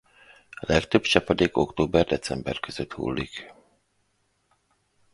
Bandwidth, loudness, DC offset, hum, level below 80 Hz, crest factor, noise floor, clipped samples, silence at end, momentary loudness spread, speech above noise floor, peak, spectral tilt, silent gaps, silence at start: 11.5 kHz; -25 LUFS; under 0.1%; none; -46 dBFS; 26 dB; -71 dBFS; under 0.1%; 1.6 s; 14 LU; 46 dB; -2 dBFS; -5 dB/octave; none; 0.6 s